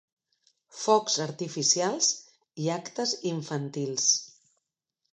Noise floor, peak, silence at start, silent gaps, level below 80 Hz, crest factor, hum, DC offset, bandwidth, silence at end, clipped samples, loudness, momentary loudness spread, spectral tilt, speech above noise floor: -83 dBFS; -8 dBFS; 0.75 s; none; -82 dBFS; 22 dB; none; under 0.1%; 9.8 kHz; 0.85 s; under 0.1%; -27 LUFS; 10 LU; -2.5 dB/octave; 55 dB